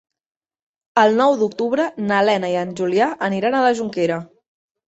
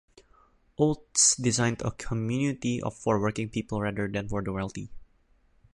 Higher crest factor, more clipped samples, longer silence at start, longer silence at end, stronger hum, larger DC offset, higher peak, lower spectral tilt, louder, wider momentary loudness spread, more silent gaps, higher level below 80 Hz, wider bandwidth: about the same, 18 dB vs 20 dB; neither; first, 0.95 s vs 0.8 s; about the same, 0.65 s vs 0.75 s; neither; neither; first, -2 dBFS vs -8 dBFS; first, -5.5 dB/octave vs -4 dB/octave; first, -19 LUFS vs -27 LUFS; second, 7 LU vs 13 LU; neither; second, -66 dBFS vs -50 dBFS; second, 8.2 kHz vs 11.5 kHz